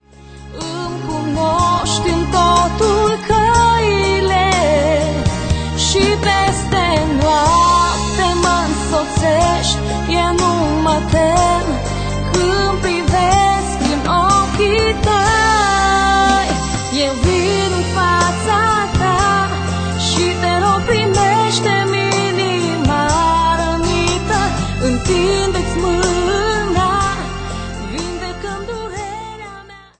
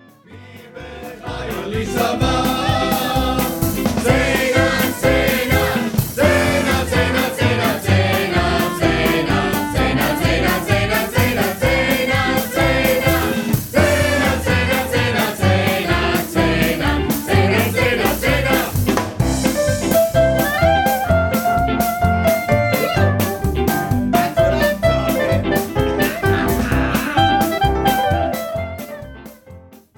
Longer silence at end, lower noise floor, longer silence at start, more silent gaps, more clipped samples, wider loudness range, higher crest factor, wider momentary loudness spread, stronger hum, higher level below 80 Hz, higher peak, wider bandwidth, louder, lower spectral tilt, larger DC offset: about the same, 0.2 s vs 0.2 s; second, -37 dBFS vs -41 dBFS; about the same, 0.25 s vs 0.3 s; neither; neither; about the same, 3 LU vs 1 LU; about the same, 14 dB vs 16 dB; first, 10 LU vs 4 LU; neither; about the same, -26 dBFS vs -30 dBFS; about the same, 0 dBFS vs 0 dBFS; second, 9.4 kHz vs 19.5 kHz; about the same, -15 LUFS vs -17 LUFS; about the same, -4.5 dB/octave vs -5 dB/octave; neither